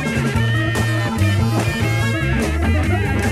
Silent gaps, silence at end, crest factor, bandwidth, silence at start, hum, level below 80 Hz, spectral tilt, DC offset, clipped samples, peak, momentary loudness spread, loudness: none; 0 s; 12 dB; 14.5 kHz; 0 s; none; -30 dBFS; -6 dB/octave; under 0.1%; under 0.1%; -4 dBFS; 1 LU; -18 LUFS